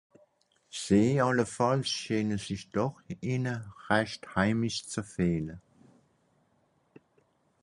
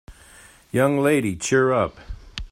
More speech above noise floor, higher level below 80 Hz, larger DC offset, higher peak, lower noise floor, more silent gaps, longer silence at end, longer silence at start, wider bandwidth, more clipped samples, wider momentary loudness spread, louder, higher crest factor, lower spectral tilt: first, 41 dB vs 29 dB; second, -58 dBFS vs -44 dBFS; neither; second, -10 dBFS vs -6 dBFS; first, -70 dBFS vs -49 dBFS; neither; first, 2.05 s vs 0.05 s; first, 0.75 s vs 0.1 s; second, 11.5 kHz vs 16 kHz; neither; second, 13 LU vs 17 LU; second, -30 LUFS vs -21 LUFS; first, 22 dB vs 16 dB; about the same, -5.5 dB/octave vs -5.5 dB/octave